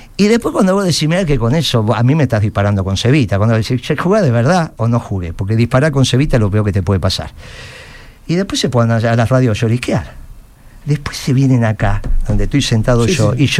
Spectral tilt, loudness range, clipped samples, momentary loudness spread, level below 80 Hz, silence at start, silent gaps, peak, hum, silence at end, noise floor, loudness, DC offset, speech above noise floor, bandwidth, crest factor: -6 dB/octave; 3 LU; under 0.1%; 8 LU; -26 dBFS; 0 s; none; 0 dBFS; none; 0 s; -38 dBFS; -14 LUFS; under 0.1%; 25 dB; 13.5 kHz; 12 dB